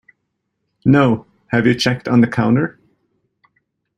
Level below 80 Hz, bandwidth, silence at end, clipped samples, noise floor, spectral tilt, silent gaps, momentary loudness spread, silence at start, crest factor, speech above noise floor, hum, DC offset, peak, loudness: -52 dBFS; 10.5 kHz; 1.3 s; under 0.1%; -73 dBFS; -6.5 dB/octave; none; 7 LU; 0.85 s; 16 dB; 59 dB; none; under 0.1%; -2 dBFS; -16 LUFS